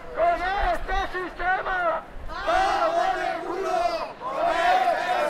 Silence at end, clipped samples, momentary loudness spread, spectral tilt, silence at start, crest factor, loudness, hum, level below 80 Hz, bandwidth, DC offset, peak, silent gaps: 0 s; under 0.1%; 9 LU; -4 dB/octave; 0 s; 14 dB; -25 LUFS; none; -40 dBFS; 14 kHz; under 0.1%; -10 dBFS; none